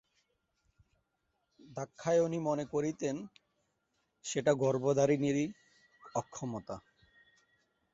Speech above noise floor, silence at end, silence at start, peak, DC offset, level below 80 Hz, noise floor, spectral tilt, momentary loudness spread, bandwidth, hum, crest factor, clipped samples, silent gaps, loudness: 49 dB; 1.15 s; 1.7 s; -16 dBFS; under 0.1%; -72 dBFS; -81 dBFS; -6 dB/octave; 16 LU; 8 kHz; none; 20 dB; under 0.1%; none; -34 LUFS